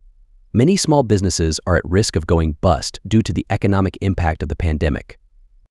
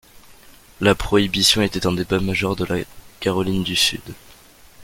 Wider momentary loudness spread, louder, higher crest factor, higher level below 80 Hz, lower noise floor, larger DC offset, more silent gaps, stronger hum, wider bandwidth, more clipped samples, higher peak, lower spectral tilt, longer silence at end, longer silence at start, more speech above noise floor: second, 6 LU vs 11 LU; about the same, -18 LUFS vs -19 LUFS; about the same, 16 dB vs 20 dB; first, -30 dBFS vs -40 dBFS; about the same, -50 dBFS vs -47 dBFS; neither; neither; neither; second, 12 kHz vs 17 kHz; neither; about the same, -2 dBFS vs -2 dBFS; first, -5.5 dB/octave vs -4 dB/octave; first, 0.6 s vs 0 s; about the same, 0.55 s vs 0.5 s; first, 33 dB vs 27 dB